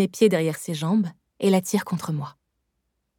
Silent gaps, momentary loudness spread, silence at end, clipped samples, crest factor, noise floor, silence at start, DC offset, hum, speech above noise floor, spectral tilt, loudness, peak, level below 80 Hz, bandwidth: none; 11 LU; 0.85 s; under 0.1%; 18 dB; -76 dBFS; 0 s; under 0.1%; none; 54 dB; -6 dB/octave; -24 LUFS; -6 dBFS; -72 dBFS; 17.5 kHz